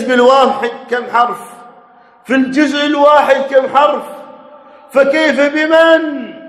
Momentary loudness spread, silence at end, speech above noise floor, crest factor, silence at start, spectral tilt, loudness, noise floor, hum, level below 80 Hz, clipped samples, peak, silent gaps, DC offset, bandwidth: 11 LU; 0 s; 33 dB; 12 dB; 0 s; -3.5 dB/octave; -11 LUFS; -43 dBFS; none; -60 dBFS; 0.4%; 0 dBFS; none; under 0.1%; 13 kHz